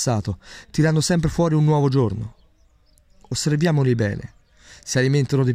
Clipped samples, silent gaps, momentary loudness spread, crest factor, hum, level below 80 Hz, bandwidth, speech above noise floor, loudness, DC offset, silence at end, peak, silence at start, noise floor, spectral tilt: under 0.1%; none; 14 LU; 16 dB; none; -44 dBFS; 15 kHz; 37 dB; -20 LUFS; under 0.1%; 0 s; -6 dBFS; 0 s; -57 dBFS; -6 dB/octave